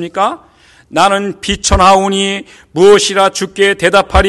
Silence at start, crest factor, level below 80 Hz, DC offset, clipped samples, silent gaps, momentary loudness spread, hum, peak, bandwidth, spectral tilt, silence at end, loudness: 0 s; 12 dB; -26 dBFS; under 0.1%; 0.2%; none; 11 LU; none; 0 dBFS; 12.5 kHz; -3.5 dB/octave; 0 s; -10 LUFS